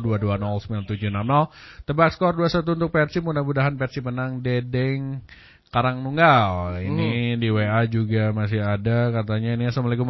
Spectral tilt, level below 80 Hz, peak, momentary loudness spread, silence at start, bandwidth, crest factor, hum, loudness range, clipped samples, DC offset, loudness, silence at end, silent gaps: -8.5 dB/octave; -44 dBFS; -4 dBFS; 8 LU; 0 s; 6 kHz; 18 dB; none; 3 LU; under 0.1%; under 0.1%; -22 LUFS; 0 s; none